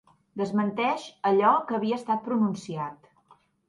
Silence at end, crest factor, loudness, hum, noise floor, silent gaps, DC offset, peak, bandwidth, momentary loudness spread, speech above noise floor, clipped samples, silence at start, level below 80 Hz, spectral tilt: 0.75 s; 18 dB; -26 LUFS; none; -61 dBFS; none; under 0.1%; -8 dBFS; 11 kHz; 13 LU; 35 dB; under 0.1%; 0.35 s; -72 dBFS; -6.5 dB/octave